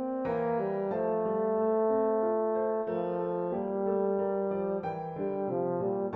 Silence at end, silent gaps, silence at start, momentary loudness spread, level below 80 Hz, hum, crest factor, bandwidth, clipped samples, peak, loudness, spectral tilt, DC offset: 0 s; none; 0 s; 5 LU; -66 dBFS; none; 12 dB; 4.2 kHz; under 0.1%; -18 dBFS; -31 LUFS; -11 dB/octave; under 0.1%